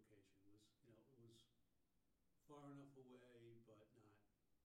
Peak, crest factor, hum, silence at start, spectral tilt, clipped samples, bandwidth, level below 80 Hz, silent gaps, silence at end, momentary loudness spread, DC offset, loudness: -50 dBFS; 18 dB; none; 0 s; -6.5 dB/octave; under 0.1%; 11.5 kHz; under -90 dBFS; none; 0 s; 6 LU; under 0.1%; -65 LUFS